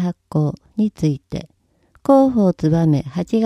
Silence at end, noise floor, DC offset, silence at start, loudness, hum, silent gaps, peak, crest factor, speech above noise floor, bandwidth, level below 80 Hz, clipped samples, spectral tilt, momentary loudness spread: 0 s; -57 dBFS; under 0.1%; 0 s; -18 LUFS; none; none; -2 dBFS; 16 dB; 40 dB; 12 kHz; -48 dBFS; under 0.1%; -9 dB/octave; 13 LU